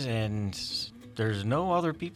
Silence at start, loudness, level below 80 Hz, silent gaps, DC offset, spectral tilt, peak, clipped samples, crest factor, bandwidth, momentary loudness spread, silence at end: 0 s; -31 LUFS; -56 dBFS; none; under 0.1%; -6 dB/octave; -16 dBFS; under 0.1%; 14 dB; 13.5 kHz; 6 LU; 0 s